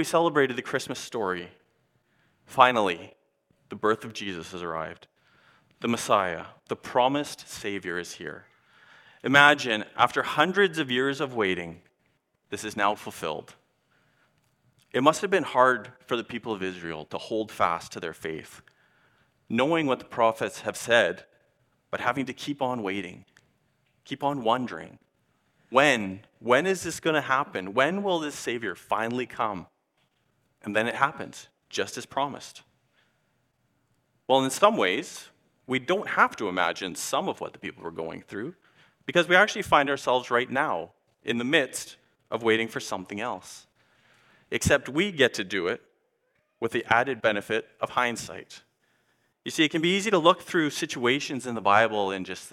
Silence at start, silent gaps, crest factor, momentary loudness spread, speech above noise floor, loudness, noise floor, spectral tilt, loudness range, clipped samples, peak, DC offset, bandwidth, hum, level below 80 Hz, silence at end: 0 s; none; 26 dB; 16 LU; 46 dB; -26 LUFS; -73 dBFS; -4 dB/octave; 7 LU; under 0.1%; 0 dBFS; under 0.1%; 16.5 kHz; none; -62 dBFS; 0.05 s